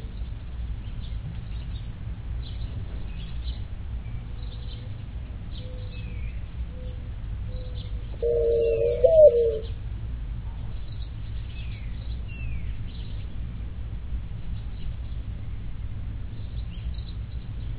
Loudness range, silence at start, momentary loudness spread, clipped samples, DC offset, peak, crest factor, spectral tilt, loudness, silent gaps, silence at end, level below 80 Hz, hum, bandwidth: 14 LU; 0 s; 14 LU; under 0.1%; under 0.1%; -6 dBFS; 22 dB; -11 dB/octave; -30 LUFS; none; 0 s; -34 dBFS; none; 4 kHz